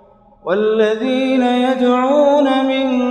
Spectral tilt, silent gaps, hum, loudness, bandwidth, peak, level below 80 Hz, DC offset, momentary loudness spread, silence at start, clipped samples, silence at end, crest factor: -5.5 dB/octave; none; none; -15 LUFS; 8.8 kHz; -2 dBFS; -58 dBFS; under 0.1%; 5 LU; 0.45 s; under 0.1%; 0 s; 14 dB